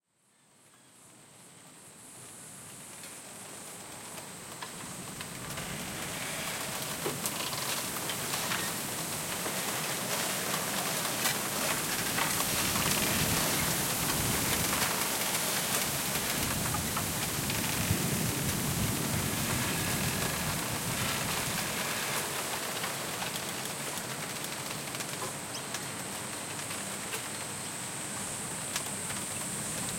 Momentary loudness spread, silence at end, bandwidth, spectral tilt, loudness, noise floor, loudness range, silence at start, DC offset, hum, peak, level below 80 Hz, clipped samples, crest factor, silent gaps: 14 LU; 0 s; 16.5 kHz; -2.5 dB/octave; -31 LUFS; -68 dBFS; 13 LU; 0.85 s; under 0.1%; none; -10 dBFS; -56 dBFS; under 0.1%; 22 dB; none